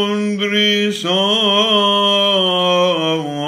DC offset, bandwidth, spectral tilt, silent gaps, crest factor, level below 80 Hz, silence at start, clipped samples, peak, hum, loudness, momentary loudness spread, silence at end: under 0.1%; 15.5 kHz; -4 dB/octave; none; 12 dB; -62 dBFS; 0 s; under 0.1%; -4 dBFS; none; -14 LUFS; 5 LU; 0 s